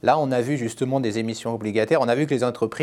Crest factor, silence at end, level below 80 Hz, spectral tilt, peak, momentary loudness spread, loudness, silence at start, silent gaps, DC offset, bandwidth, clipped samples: 18 dB; 0 s; -64 dBFS; -6 dB/octave; -4 dBFS; 6 LU; -23 LUFS; 0.05 s; none; under 0.1%; 13.5 kHz; under 0.1%